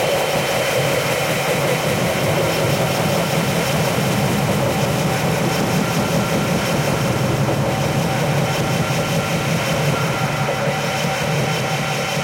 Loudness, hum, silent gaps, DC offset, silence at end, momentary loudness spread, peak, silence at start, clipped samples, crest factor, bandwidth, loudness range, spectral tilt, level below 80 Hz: -18 LUFS; none; none; under 0.1%; 0 s; 2 LU; -6 dBFS; 0 s; under 0.1%; 12 dB; 16.5 kHz; 1 LU; -4.5 dB/octave; -44 dBFS